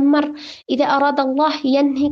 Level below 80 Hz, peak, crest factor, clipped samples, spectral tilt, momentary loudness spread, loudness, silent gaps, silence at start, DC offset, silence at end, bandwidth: -60 dBFS; -4 dBFS; 14 dB; under 0.1%; -5 dB/octave; 9 LU; -17 LUFS; none; 0 s; under 0.1%; 0 s; 6.6 kHz